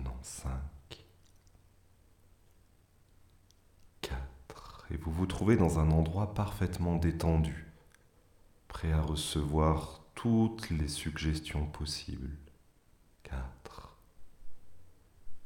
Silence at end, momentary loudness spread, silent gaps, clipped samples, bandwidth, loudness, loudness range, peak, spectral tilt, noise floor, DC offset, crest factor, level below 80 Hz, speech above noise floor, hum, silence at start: 0 s; 22 LU; none; under 0.1%; 17 kHz; -33 LUFS; 18 LU; -14 dBFS; -6.5 dB/octave; -64 dBFS; under 0.1%; 22 dB; -44 dBFS; 33 dB; none; 0 s